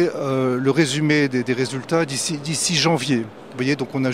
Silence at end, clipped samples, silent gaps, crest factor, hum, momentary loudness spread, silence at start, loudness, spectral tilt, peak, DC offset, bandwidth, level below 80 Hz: 0 s; under 0.1%; none; 18 dB; none; 6 LU; 0 s; -20 LUFS; -4.5 dB/octave; -4 dBFS; 0.2%; 15.5 kHz; -62 dBFS